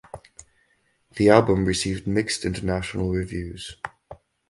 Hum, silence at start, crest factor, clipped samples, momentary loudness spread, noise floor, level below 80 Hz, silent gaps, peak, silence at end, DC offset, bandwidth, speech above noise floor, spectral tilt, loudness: none; 0.15 s; 24 dB; under 0.1%; 20 LU; -66 dBFS; -42 dBFS; none; 0 dBFS; 0.35 s; under 0.1%; 11.5 kHz; 44 dB; -5.5 dB/octave; -23 LUFS